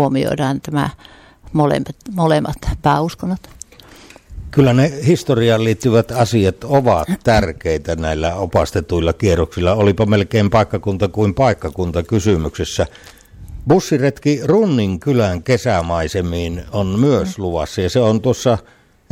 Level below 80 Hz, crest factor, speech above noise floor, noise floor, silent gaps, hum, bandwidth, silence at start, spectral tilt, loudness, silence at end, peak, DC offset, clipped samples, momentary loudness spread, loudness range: -34 dBFS; 14 dB; 26 dB; -42 dBFS; none; none; 16 kHz; 0 s; -6.5 dB/octave; -16 LUFS; 0.5 s; -2 dBFS; under 0.1%; under 0.1%; 7 LU; 3 LU